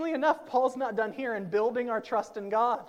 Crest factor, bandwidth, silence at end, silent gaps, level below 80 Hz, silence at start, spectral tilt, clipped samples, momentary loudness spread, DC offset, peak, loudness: 16 dB; 12.5 kHz; 0 s; none; -76 dBFS; 0 s; -5.5 dB/octave; under 0.1%; 5 LU; under 0.1%; -12 dBFS; -29 LUFS